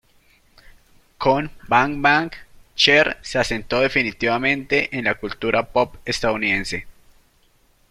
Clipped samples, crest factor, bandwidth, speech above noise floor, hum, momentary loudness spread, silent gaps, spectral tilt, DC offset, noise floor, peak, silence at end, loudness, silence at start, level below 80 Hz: under 0.1%; 20 dB; 15 kHz; 38 dB; none; 7 LU; none; -4 dB/octave; under 0.1%; -58 dBFS; -2 dBFS; 1 s; -19 LUFS; 1.2 s; -44 dBFS